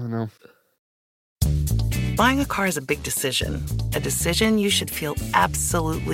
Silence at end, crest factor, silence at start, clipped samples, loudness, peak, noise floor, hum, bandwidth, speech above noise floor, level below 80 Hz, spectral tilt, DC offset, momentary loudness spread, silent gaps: 0 s; 20 dB; 0 s; under 0.1%; -22 LUFS; -4 dBFS; under -90 dBFS; none; 17 kHz; over 67 dB; -32 dBFS; -4 dB/octave; under 0.1%; 8 LU; 0.79-1.36 s